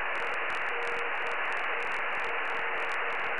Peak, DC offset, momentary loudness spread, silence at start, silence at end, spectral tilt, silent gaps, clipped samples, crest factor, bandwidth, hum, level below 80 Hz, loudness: -18 dBFS; 1%; 1 LU; 0 s; 0 s; -2.5 dB/octave; none; under 0.1%; 12 dB; 11.5 kHz; none; -68 dBFS; -31 LUFS